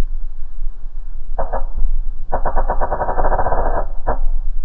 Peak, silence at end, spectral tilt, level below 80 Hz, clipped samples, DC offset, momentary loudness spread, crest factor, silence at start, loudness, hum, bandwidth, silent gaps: -2 dBFS; 0 s; -10.5 dB/octave; -18 dBFS; under 0.1%; under 0.1%; 14 LU; 12 dB; 0 s; -23 LUFS; none; 1.9 kHz; none